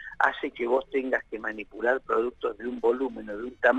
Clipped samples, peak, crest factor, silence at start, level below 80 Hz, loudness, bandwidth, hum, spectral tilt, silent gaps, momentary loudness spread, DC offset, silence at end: under 0.1%; -6 dBFS; 20 dB; 0 s; -58 dBFS; -28 LUFS; 8.4 kHz; none; -5.5 dB/octave; none; 8 LU; under 0.1%; 0 s